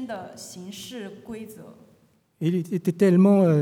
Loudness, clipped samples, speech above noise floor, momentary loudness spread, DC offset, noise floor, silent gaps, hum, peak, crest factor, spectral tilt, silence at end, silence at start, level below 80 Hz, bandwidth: -21 LUFS; under 0.1%; 38 dB; 21 LU; under 0.1%; -61 dBFS; none; none; -8 dBFS; 16 dB; -8 dB/octave; 0 s; 0 s; -72 dBFS; 15 kHz